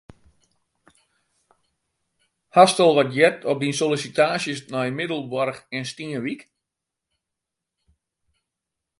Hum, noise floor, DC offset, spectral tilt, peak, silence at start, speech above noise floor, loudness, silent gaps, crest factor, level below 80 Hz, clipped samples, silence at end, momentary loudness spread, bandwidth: none; -84 dBFS; under 0.1%; -4.5 dB/octave; 0 dBFS; 2.55 s; 64 dB; -21 LUFS; none; 24 dB; -68 dBFS; under 0.1%; 2.6 s; 14 LU; 11.5 kHz